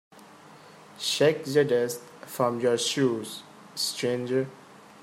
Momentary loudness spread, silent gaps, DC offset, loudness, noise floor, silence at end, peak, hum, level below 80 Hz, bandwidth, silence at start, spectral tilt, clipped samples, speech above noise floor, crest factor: 15 LU; none; under 0.1%; -26 LUFS; -50 dBFS; 0.25 s; -10 dBFS; none; -76 dBFS; 16 kHz; 0.15 s; -4 dB/octave; under 0.1%; 24 dB; 18 dB